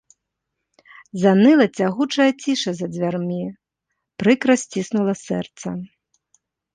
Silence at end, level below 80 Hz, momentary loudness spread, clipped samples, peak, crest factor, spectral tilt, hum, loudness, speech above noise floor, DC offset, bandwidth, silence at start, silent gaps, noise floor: 0.9 s; -64 dBFS; 16 LU; under 0.1%; -2 dBFS; 18 dB; -5.5 dB/octave; none; -19 LUFS; 61 dB; under 0.1%; 9.8 kHz; 1.15 s; none; -79 dBFS